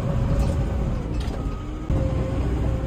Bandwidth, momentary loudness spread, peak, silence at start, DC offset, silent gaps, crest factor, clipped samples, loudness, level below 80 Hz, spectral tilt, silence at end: 9.8 kHz; 6 LU; -10 dBFS; 0 s; under 0.1%; none; 12 dB; under 0.1%; -26 LUFS; -26 dBFS; -8 dB/octave; 0 s